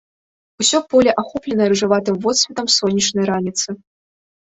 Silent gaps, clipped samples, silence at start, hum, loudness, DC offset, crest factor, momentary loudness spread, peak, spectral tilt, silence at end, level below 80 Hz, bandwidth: none; under 0.1%; 0.6 s; none; -17 LUFS; under 0.1%; 16 dB; 8 LU; -2 dBFS; -3 dB/octave; 0.75 s; -56 dBFS; 8.4 kHz